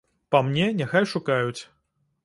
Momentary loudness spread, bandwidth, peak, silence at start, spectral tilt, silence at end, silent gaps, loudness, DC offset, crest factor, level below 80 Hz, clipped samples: 6 LU; 11.5 kHz; -4 dBFS; 0.3 s; -6 dB/octave; 0.6 s; none; -24 LUFS; under 0.1%; 22 dB; -64 dBFS; under 0.1%